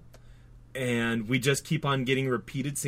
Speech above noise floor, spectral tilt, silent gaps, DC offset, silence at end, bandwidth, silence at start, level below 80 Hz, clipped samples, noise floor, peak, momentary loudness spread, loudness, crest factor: 23 dB; -5 dB/octave; none; under 0.1%; 0 s; 16 kHz; 0.05 s; -56 dBFS; under 0.1%; -51 dBFS; -12 dBFS; 7 LU; -28 LUFS; 16 dB